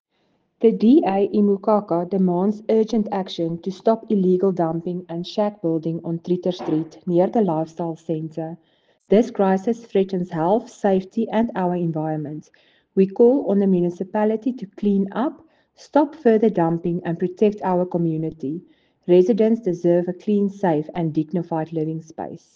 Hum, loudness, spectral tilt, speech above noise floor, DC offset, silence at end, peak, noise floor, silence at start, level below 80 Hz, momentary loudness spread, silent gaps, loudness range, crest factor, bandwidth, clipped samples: none; -21 LUFS; -8.5 dB/octave; 47 dB; under 0.1%; 0.2 s; -4 dBFS; -67 dBFS; 0.6 s; -64 dBFS; 11 LU; none; 3 LU; 16 dB; 7.4 kHz; under 0.1%